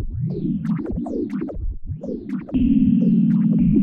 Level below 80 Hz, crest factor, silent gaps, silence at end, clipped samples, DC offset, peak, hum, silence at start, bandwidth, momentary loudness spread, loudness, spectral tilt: -32 dBFS; 12 dB; none; 0 s; under 0.1%; under 0.1%; -6 dBFS; none; 0 s; 3.5 kHz; 13 LU; -21 LUFS; -11.5 dB/octave